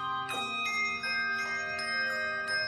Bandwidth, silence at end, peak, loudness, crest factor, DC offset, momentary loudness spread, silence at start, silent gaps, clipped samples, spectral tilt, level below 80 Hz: 13.5 kHz; 0 s; -22 dBFS; -31 LUFS; 12 dB; under 0.1%; 3 LU; 0 s; none; under 0.1%; -1.5 dB/octave; -68 dBFS